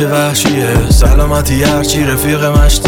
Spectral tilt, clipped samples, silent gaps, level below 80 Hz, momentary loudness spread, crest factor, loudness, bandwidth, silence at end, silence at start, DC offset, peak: -4.5 dB/octave; under 0.1%; none; -12 dBFS; 3 LU; 10 dB; -11 LUFS; 19.5 kHz; 0 s; 0 s; under 0.1%; 0 dBFS